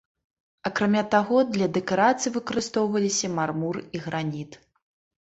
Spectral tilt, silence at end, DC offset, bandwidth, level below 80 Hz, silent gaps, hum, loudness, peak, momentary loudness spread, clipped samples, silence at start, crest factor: -4.5 dB/octave; 0.65 s; under 0.1%; 8.2 kHz; -62 dBFS; none; none; -25 LUFS; -6 dBFS; 11 LU; under 0.1%; 0.65 s; 20 dB